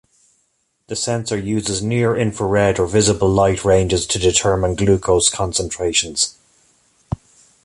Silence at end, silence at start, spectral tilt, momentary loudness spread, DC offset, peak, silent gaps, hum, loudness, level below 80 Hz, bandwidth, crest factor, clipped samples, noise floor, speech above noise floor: 0.5 s; 0.9 s; -4 dB/octave; 7 LU; under 0.1%; 0 dBFS; none; none; -17 LUFS; -36 dBFS; 11.5 kHz; 18 dB; under 0.1%; -66 dBFS; 49 dB